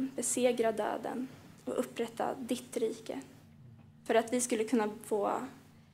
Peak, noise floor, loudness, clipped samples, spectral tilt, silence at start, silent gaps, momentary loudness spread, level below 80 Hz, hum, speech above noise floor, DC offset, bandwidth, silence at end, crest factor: -14 dBFS; -56 dBFS; -34 LUFS; under 0.1%; -3.5 dB/octave; 0 s; none; 15 LU; -76 dBFS; none; 22 dB; under 0.1%; 16 kHz; 0.15 s; 20 dB